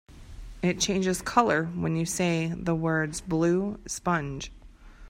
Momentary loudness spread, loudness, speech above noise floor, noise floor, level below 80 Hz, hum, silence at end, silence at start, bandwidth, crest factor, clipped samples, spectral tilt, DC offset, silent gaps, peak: 11 LU; -27 LUFS; 21 dB; -48 dBFS; -48 dBFS; none; 0 s; 0.1 s; 16 kHz; 22 dB; under 0.1%; -5 dB/octave; under 0.1%; none; -6 dBFS